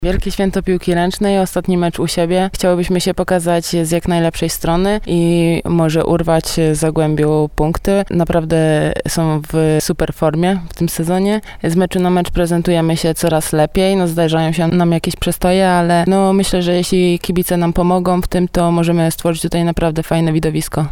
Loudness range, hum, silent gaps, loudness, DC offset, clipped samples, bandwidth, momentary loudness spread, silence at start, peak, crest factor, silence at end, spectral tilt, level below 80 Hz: 2 LU; none; none; -15 LUFS; 0.1%; under 0.1%; 17 kHz; 4 LU; 0 s; -2 dBFS; 12 dB; 0 s; -6 dB/octave; -30 dBFS